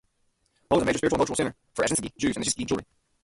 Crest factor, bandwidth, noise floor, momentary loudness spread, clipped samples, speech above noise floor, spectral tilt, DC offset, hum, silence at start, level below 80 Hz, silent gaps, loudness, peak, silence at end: 20 dB; 11.5 kHz; -71 dBFS; 6 LU; under 0.1%; 45 dB; -4 dB/octave; under 0.1%; none; 0.7 s; -52 dBFS; none; -26 LUFS; -8 dBFS; 0.4 s